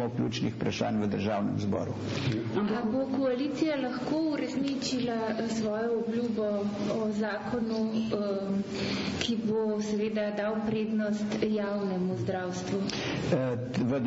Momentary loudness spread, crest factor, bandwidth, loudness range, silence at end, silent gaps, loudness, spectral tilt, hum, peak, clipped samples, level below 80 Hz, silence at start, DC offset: 2 LU; 14 dB; 8 kHz; 1 LU; 0 s; none; -30 LUFS; -6 dB/octave; none; -16 dBFS; under 0.1%; -60 dBFS; 0 s; under 0.1%